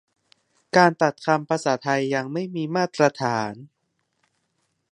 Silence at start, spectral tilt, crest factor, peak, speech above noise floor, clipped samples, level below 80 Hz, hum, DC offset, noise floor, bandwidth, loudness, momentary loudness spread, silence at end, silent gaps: 0.75 s; -5.5 dB/octave; 24 dB; 0 dBFS; 52 dB; under 0.1%; -72 dBFS; none; under 0.1%; -74 dBFS; 11 kHz; -22 LUFS; 10 LU; 1.25 s; none